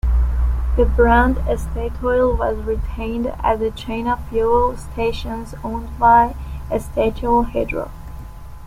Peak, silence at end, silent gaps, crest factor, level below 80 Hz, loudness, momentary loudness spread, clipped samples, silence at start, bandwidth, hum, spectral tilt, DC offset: -2 dBFS; 0 s; none; 16 dB; -24 dBFS; -19 LUFS; 14 LU; under 0.1%; 0.05 s; 14.5 kHz; none; -7.5 dB/octave; under 0.1%